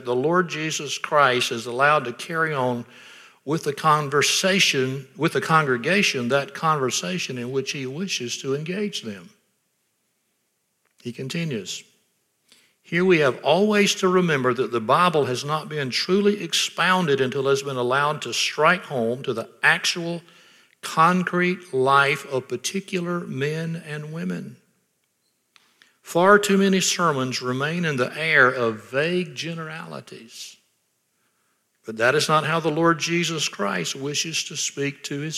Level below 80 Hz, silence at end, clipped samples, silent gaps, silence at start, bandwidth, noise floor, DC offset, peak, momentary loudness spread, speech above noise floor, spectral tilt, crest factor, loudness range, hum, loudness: -74 dBFS; 0 s; under 0.1%; none; 0 s; 15.5 kHz; -72 dBFS; under 0.1%; -2 dBFS; 13 LU; 50 dB; -4 dB/octave; 20 dB; 10 LU; none; -22 LUFS